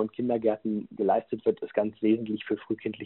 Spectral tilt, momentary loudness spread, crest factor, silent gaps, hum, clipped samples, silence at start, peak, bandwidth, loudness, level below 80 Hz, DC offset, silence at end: -6 dB/octave; 6 LU; 18 dB; none; none; under 0.1%; 0 s; -10 dBFS; 4.2 kHz; -29 LUFS; -70 dBFS; under 0.1%; 0 s